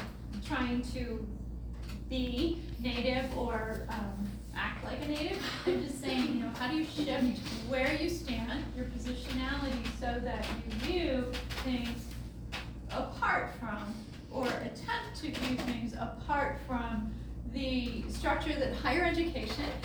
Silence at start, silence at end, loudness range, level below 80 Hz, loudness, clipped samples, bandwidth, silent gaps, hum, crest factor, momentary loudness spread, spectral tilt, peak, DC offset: 0 s; 0 s; 3 LU; -44 dBFS; -35 LUFS; under 0.1%; over 20 kHz; none; none; 18 dB; 9 LU; -5.5 dB/octave; -18 dBFS; under 0.1%